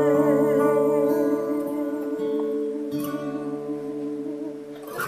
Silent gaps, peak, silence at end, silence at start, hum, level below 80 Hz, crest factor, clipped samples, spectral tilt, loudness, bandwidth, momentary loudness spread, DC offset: none; -10 dBFS; 0 s; 0 s; none; -72 dBFS; 14 dB; under 0.1%; -7 dB/octave; -25 LUFS; 15 kHz; 12 LU; under 0.1%